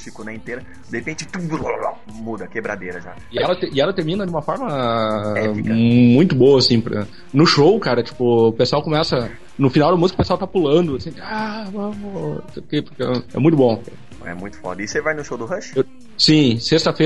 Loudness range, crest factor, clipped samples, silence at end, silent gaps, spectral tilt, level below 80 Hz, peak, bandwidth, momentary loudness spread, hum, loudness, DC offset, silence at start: 8 LU; 16 dB; under 0.1%; 0 s; none; -6 dB/octave; -46 dBFS; -2 dBFS; 11 kHz; 17 LU; none; -18 LUFS; 1%; 0 s